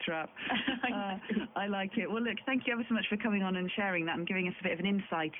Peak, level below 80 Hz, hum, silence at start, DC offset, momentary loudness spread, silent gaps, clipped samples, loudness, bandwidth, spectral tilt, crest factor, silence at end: -18 dBFS; -70 dBFS; none; 0 s; under 0.1%; 4 LU; none; under 0.1%; -33 LUFS; 3.9 kHz; -9 dB/octave; 16 dB; 0 s